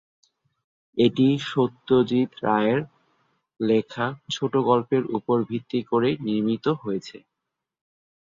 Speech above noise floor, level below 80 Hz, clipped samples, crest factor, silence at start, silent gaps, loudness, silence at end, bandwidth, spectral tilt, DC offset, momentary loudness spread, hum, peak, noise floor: 61 dB; -64 dBFS; under 0.1%; 18 dB; 0.95 s; none; -24 LUFS; 1.2 s; 7.6 kHz; -7 dB/octave; under 0.1%; 8 LU; none; -6 dBFS; -84 dBFS